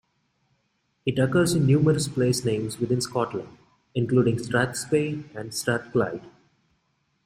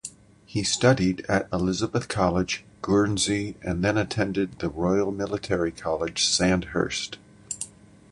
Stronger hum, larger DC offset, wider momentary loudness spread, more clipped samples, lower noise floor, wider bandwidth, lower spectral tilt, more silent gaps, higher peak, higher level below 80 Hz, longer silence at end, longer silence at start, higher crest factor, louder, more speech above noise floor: neither; neither; about the same, 11 LU vs 12 LU; neither; first, -72 dBFS vs -44 dBFS; first, 16 kHz vs 11.5 kHz; about the same, -5.5 dB/octave vs -4.5 dB/octave; neither; second, -8 dBFS vs -4 dBFS; second, -58 dBFS vs -46 dBFS; first, 0.95 s vs 0.45 s; first, 1.05 s vs 0.05 s; about the same, 18 dB vs 22 dB; about the same, -25 LUFS vs -25 LUFS; first, 48 dB vs 20 dB